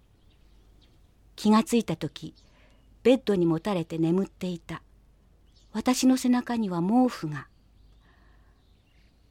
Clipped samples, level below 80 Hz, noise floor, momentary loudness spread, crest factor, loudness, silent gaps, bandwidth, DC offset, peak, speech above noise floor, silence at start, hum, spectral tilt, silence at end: under 0.1%; -58 dBFS; -60 dBFS; 15 LU; 18 dB; -26 LUFS; none; 16 kHz; under 0.1%; -10 dBFS; 35 dB; 1.4 s; none; -6 dB/octave; 1.85 s